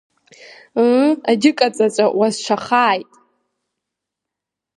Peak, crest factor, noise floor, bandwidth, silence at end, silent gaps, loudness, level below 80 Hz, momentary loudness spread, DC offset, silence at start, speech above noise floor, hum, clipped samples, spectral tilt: 0 dBFS; 18 dB; -83 dBFS; 11.5 kHz; 1.75 s; none; -16 LUFS; -70 dBFS; 6 LU; under 0.1%; 0.75 s; 67 dB; none; under 0.1%; -4 dB/octave